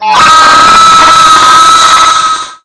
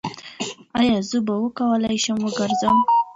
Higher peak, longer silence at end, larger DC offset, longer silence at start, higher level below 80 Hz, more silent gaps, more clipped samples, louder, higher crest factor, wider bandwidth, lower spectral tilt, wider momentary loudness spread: first, 0 dBFS vs -6 dBFS; about the same, 0.1 s vs 0 s; neither; about the same, 0 s vs 0.05 s; first, -34 dBFS vs -54 dBFS; neither; first, 20% vs under 0.1%; first, -2 LUFS vs -21 LUFS; second, 4 dB vs 14 dB; first, 11 kHz vs 8.2 kHz; second, 0 dB/octave vs -4.5 dB/octave; second, 4 LU vs 13 LU